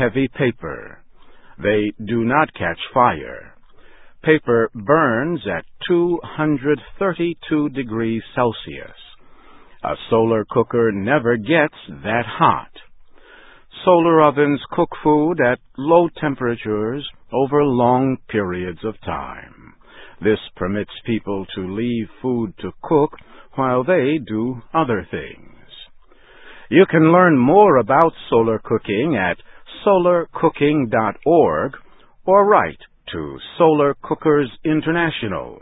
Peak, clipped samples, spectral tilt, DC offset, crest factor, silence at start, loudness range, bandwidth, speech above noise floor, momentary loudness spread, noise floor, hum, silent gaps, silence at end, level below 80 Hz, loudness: 0 dBFS; under 0.1%; -10.5 dB/octave; under 0.1%; 18 dB; 0 s; 7 LU; 4 kHz; 28 dB; 14 LU; -46 dBFS; none; none; 0.05 s; -48 dBFS; -18 LUFS